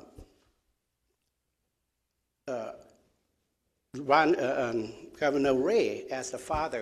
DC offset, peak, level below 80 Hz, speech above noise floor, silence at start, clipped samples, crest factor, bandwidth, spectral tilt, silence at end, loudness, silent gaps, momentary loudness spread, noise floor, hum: under 0.1%; -10 dBFS; -58 dBFS; 53 dB; 0.2 s; under 0.1%; 22 dB; 13.5 kHz; -4.5 dB/octave; 0 s; -29 LUFS; none; 17 LU; -81 dBFS; none